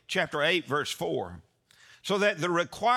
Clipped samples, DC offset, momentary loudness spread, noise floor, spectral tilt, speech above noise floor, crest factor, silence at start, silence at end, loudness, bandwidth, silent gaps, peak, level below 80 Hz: under 0.1%; under 0.1%; 9 LU; -58 dBFS; -4 dB/octave; 30 dB; 16 dB; 0.1 s; 0 s; -28 LUFS; 17.5 kHz; none; -12 dBFS; -68 dBFS